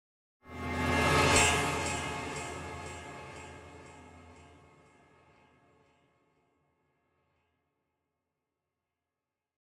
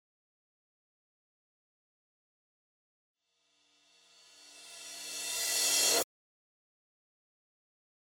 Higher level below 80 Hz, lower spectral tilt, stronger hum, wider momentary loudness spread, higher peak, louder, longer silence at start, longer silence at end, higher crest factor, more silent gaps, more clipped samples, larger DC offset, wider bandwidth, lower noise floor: first, -56 dBFS vs -82 dBFS; first, -3 dB/octave vs 2 dB/octave; neither; first, 25 LU vs 22 LU; first, -10 dBFS vs -16 dBFS; about the same, -29 LUFS vs -29 LUFS; second, 0.45 s vs 4.45 s; first, 5.15 s vs 2 s; about the same, 26 dB vs 24 dB; neither; neither; neither; second, 16 kHz vs 19.5 kHz; first, -90 dBFS vs -76 dBFS